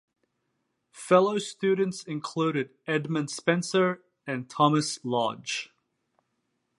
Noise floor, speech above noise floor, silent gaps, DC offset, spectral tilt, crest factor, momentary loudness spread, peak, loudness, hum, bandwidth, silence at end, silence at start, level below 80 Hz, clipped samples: -78 dBFS; 51 dB; none; under 0.1%; -5 dB/octave; 24 dB; 12 LU; -6 dBFS; -27 LUFS; none; 11.5 kHz; 1.15 s; 0.95 s; -78 dBFS; under 0.1%